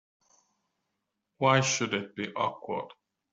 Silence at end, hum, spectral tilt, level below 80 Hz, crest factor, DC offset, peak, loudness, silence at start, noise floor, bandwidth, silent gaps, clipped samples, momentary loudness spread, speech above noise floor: 0.4 s; none; -3.5 dB/octave; -72 dBFS; 24 dB; under 0.1%; -8 dBFS; -29 LUFS; 1.4 s; -83 dBFS; 8 kHz; none; under 0.1%; 13 LU; 54 dB